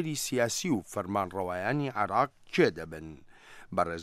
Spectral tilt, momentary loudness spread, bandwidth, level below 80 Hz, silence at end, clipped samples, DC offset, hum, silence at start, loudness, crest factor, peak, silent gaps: -4.5 dB/octave; 12 LU; 15.5 kHz; -62 dBFS; 0 s; under 0.1%; under 0.1%; none; 0 s; -30 LUFS; 20 dB; -10 dBFS; none